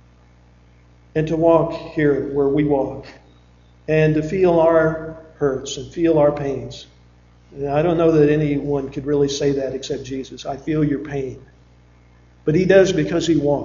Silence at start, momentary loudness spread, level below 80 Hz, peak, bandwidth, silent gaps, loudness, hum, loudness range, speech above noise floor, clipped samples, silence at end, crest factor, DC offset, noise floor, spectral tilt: 1.15 s; 14 LU; -44 dBFS; -2 dBFS; 7.6 kHz; none; -19 LUFS; 60 Hz at -55 dBFS; 4 LU; 32 dB; under 0.1%; 0 s; 18 dB; under 0.1%; -50 dBFS; -6.5 dB/octave